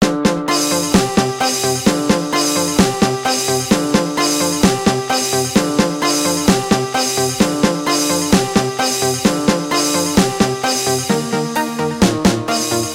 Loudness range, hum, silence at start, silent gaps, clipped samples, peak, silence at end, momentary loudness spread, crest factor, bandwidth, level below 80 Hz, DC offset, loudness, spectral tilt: 1 LU; none; 0 s; none; under 0.1%; 0 dBFS; 0 s; 3 LU; 16 dB; 17 kHz; -40 dBFS; under 0.1%; -15 LUFS; -3.5 dB/octave